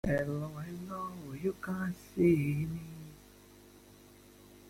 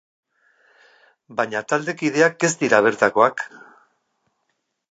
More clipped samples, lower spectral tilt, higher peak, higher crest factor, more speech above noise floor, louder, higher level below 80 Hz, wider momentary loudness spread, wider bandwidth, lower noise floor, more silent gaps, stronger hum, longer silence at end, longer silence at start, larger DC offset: neither; first, -8 dB/octave vs -4 dB/octave; second, -16 dBFS vs -2 dBFS; about the same, 20 dB vs 22 dB; second, 24 dB vs 54 dB; second, -35 LUFS vs -19 LUFS; first, -58 dBFS vs -74 dBFS; first, 20 LU vs 12 LU; first, 16.5 kHz vs 9.2 kHz; second, -57 dBFS vs -74 dBFS; neither; first, 50 Hz at -55 dBFS vs none; second, 0 s vs 1.45 s; second, 0.05 s vs 1.3 s; neither